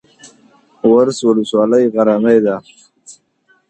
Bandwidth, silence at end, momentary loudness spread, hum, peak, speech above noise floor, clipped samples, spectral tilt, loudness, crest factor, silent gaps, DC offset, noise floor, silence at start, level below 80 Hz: 9.4 kHz; 0.6 s; 6 LU; none; 0 dBFS; 45 dB; under 0.1%; -6 dB/octave; -13 LUFS; 14 dB; none; under 0.1%; -57 dBFS; 0.85 s; -60 dBFS